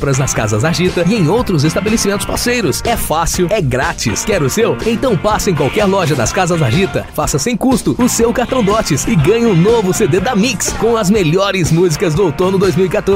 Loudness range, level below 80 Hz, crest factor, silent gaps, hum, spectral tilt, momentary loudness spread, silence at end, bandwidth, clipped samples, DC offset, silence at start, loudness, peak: 2 LU; -30 dBFS; 10 dB; none; none; -5 dB/octave; 3 LU; 0 s; 16.5 kHz; under 0.1%; 0.2%; 0 s; -13 LUFS; -2 dBFS